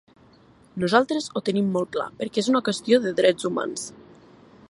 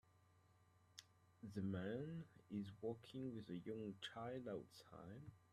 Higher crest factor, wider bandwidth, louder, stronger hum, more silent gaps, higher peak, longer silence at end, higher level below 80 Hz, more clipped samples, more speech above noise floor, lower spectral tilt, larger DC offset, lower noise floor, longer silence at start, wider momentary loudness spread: about the same, 22 dB vs 18 dB; second, 11.5 kHz vs 13.5 kHz; first, -23 LUFS vs -52 LUFS; neither; neither; first, -2 dBFS vs -34 dBFS; first, 0.7 s vs 0.1 s; first, -66 dBFS vs -82 dBFS; neither; first, 31 dB vs 24 dB; second, -5 dB/octave vs -6.5 dB/octave; neither; second, -54 dBFS vs -75 dBFS; first, 0.75 s vs 0.15 s; second, 9 LU vs 14 LU